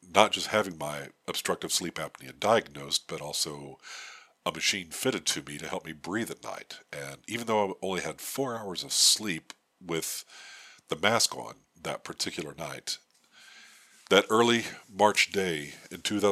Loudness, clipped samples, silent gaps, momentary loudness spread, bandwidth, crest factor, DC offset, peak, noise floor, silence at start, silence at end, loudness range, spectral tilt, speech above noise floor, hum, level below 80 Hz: -29 LUFS; under 0.1%; none; 18 LU; 15.5 kHz; 28 dB; under 0.1%; -4 dBFS; -57 dBFS; 0.05 s; 0 s; 5 LU; -2 dB/octave; 27 dB; none; -68 dBFS